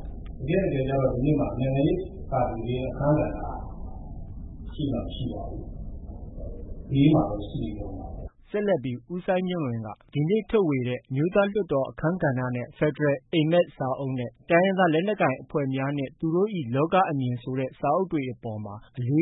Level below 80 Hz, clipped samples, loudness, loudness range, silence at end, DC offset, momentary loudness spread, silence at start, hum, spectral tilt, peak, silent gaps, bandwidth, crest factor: -42 dBFS; under 0.1%; -26 LUFS; 5 LU; 0 s; under 0.1%; 17 LU; 0 s; none; -12 dB/octave; -8 dBFS; none; 4 kHz; 18 dB